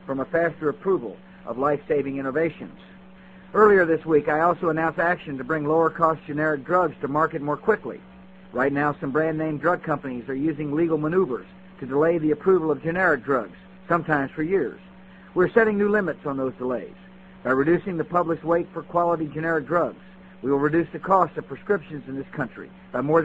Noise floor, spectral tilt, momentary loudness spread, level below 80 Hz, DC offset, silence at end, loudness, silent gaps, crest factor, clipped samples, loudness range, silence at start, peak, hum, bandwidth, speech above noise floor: -47 dBFS; -9 dB/octave; 11 LU; -56 dBFS; under 0.1%; 0 s; -23 LUFS; none; 20 dB; under 0.1%; 3 LU; 0 s; -4 dBFS; none; 7.8 kHz; 24 dB